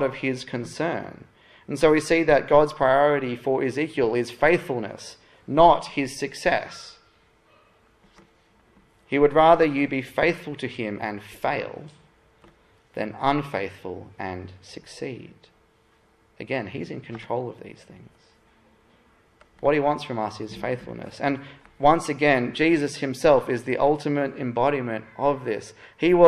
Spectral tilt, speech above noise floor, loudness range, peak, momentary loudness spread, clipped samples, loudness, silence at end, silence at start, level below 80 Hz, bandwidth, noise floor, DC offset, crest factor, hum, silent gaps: -6 dB/octave; 38 dB; 13 LU; -2 dBFS; 18 LU; under 0.1%; -23 LUFS; 0 s; 0 s; -54 dBFS; 13 kHz; -61 dBFS; under 0.1%; 22 dB; none; none